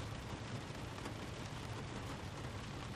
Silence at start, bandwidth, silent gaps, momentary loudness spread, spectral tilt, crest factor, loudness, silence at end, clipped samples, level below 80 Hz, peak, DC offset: 0 s; 15 kHz; none; 1 LU; -5 dB/octave; 16 dB; -46 LUFS; 0 s; under 0.1%; -56 dBFS; -30 dBFS; under 0.1%